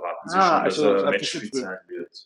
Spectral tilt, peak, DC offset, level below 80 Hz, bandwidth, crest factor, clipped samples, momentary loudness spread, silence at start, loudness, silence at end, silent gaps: -4 dB/octave; -4 dBFS; under 0.1%; -70 dBFS; 11.5 kHz; 18 dB; under 0.1%; 15 LU; 0 s; -22 LUFS; 0.05 s; none